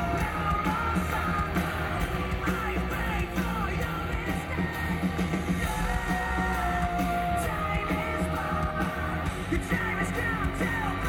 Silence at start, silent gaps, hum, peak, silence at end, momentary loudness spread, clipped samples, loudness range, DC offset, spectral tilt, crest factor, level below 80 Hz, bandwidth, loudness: 0 s; none; none; -14 dBFS; 0 s; 3 LU; under 0.1%; 1 LU; under 0.1%; -6 dB/octave; 14 dB; -36 dBFS; 17 kHz; -29 LUFS